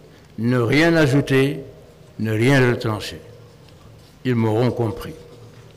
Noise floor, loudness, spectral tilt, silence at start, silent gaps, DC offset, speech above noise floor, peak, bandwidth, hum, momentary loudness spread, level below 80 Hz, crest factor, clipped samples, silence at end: -45 dBFS; -19 LUFS; -6.5 dB/octave; 0.4 s; none; under 0.1%; 27 dB; -10 dBFS; 15.5 kHz; none; 20 LU; -48 dBFS; 12 dB; under 0.1%; 0.15 s